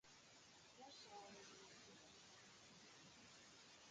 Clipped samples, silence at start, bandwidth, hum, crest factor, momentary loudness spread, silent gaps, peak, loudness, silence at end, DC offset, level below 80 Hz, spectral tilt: under 0.1%; 0.05 s; 9 kHz; none; 16 dB; 6 LU; none; -48 dBFS; -63 LUFS; 0 s; under 0.1%; -90 dBFS; -2 dB/octave